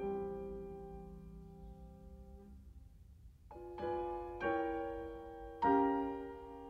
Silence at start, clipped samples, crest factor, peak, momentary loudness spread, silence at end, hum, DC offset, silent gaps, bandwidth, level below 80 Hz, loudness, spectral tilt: 0 s; under 0.1%; 20 dB; -20 dBFS; 24 LU; 0 s; none; under 0.1%; none; 6.2 kHz; -58 dBFS; -39 LUFS; -8 dB/octave